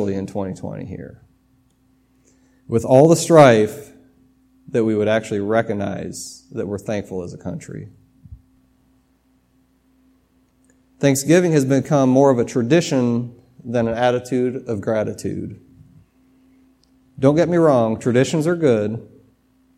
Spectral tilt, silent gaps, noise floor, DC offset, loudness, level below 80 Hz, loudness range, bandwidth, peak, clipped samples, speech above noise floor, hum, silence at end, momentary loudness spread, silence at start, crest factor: -6 dB/octave; none; -60 dBFS; under 0.1%; -18 LUFS; -56 dBFS; 13 LU; 16 kHz; 0 dBFS; under 0.1%; 43 dB; none; 0.75 s; 19 LU; 0 s; 20 dB